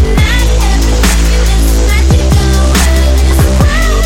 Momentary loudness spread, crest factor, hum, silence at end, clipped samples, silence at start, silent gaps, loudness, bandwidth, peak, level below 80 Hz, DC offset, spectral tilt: 2 LU; 8 dB; none; 0 s; under 0.1%; 0 s; none; -9 LUFS; 16.5 kHz; 0 dBFS; -8 dBFS; under 0.1%; -5 dB/octave